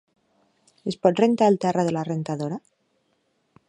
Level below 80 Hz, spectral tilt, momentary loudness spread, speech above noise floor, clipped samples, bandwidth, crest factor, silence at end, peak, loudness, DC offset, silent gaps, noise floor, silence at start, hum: -70 dBFS; -7 dB/octave; 14 LU; 48 dB; under 0.1%; 10.5 kHz; 22 dB; 1.1 s; -4 dBFS; -23 LUFS; under 0.1%; none; -70 dBFS; 0.85 s; none